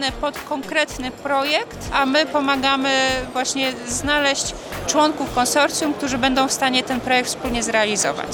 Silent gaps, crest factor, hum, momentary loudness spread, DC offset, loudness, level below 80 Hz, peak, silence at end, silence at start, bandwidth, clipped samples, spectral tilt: none; 16 dB; none; 6 LU; under 0.1%; -19 LUFS; -42 dBFS; -4 dBFS; 0 s; 0 s; 19.5 kHz; under 0.1%; -2 dB/octave